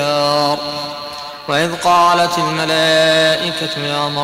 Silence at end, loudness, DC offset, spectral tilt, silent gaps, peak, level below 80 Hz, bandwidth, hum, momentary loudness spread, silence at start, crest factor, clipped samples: 0 s; -14 LUFS; under 0.1%; -3.5 dB/octave; none; -4 dBFS; -54 dBFS; 16 kHz; none; 12 LU; 0 s; 12 dB; under 0.1%